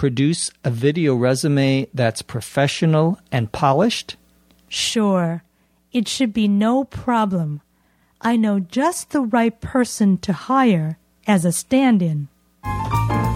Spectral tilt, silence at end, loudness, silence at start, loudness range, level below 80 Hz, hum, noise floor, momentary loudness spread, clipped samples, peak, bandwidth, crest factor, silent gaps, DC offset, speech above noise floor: -5.5 dB/octave; 0 s; -19 LUFS; 0 s; 2 LU; -44 dBFS; none; -60 dBFS; 11 LU; under 0.1%; -2 dBFS; 15.5 kHz; 16 dB; none; under 0.1%; 42 dB